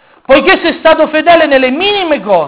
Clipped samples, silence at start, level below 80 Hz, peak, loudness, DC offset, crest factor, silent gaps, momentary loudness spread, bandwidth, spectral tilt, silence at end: 3%; 0.3 s; -40 dBFS; 0 dBFS; -8 LUFS; under 0.1%; 8 dB; none; 4 LU; 4 kHz; -7.5 dB/octave; 0 s